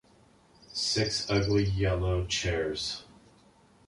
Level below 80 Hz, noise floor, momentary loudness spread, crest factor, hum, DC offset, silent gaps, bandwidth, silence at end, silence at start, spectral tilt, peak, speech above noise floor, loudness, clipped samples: -42 dBFS; -61 dBFS; 8 LU; 18 dB; none; under 0.1%; none; 11.5 kHz; 0.85 s; 0.7 s; -4.5 dB/octave; -14 dBFS; 32 dB; -29 LUFS; under 0.1%